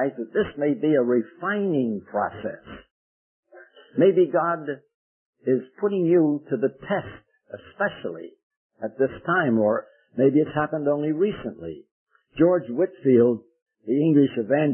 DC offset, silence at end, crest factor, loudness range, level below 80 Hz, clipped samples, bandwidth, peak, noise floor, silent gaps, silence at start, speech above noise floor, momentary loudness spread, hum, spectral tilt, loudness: under 0.1%; 0 s; 18 dB; 4 LU; -62 dBFS; under 0.1%; 3.3 kHz; -6 dBFS; -50 dBFS; 2.91-3.43 s, 4.94-5.33 s, 8.43-8.51 s, 8.57-8.70 s, 11.91-12.06 s, 13.62-13.66 s; 0 s; 28 dB; 17 LU; none; -12 dB/octave; -23 LUFS